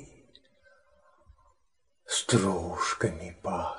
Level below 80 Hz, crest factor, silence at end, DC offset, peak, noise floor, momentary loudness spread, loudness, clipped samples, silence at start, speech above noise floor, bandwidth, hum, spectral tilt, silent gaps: -56 dBFS; 24 dB; 0 s; under 0.1%; -10 dBFS; -78 dBFS; 8 LU; -29 LUFS; under 0.1%; 0 s; 49 dB; 12.5 kHz; none; -4 dB/octave; none